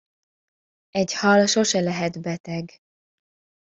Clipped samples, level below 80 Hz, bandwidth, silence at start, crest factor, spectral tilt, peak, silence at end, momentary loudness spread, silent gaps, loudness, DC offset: under 0.1%; -64 dBFS; 8 kHz; 0.95 s; 20 dB; -4 dB/octave; -4 dBFS; 1 s; 15 LU; 2.40-2.44 s; -22 LUFS; under 0.1%